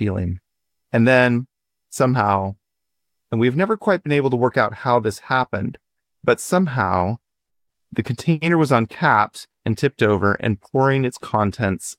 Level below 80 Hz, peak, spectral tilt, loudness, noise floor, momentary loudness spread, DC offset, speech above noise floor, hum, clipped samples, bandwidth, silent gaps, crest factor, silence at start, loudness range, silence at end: -52 dBFS; -2 dBFS; -6.5 dB/octave; -20 LUFS; -81 dBFS; 11 LU; under 0.1%; 63 dB; none; under 0.1%; 16 kHz; none; 18 dB; 0 s; 3 LU; 0.05 s